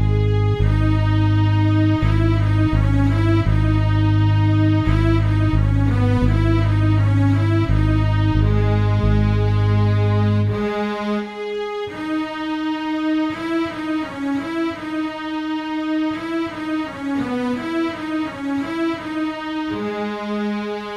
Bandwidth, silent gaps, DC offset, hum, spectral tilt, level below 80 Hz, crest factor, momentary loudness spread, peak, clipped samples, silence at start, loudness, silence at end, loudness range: 7 kHz; none; under 0.1%; none; -8.5 dB/octave; -28 dBFS; 14 dB; 8 LU; -4 dBFS; under 0.1%; 0 s; -19 LUFS; 0 s; 6 LU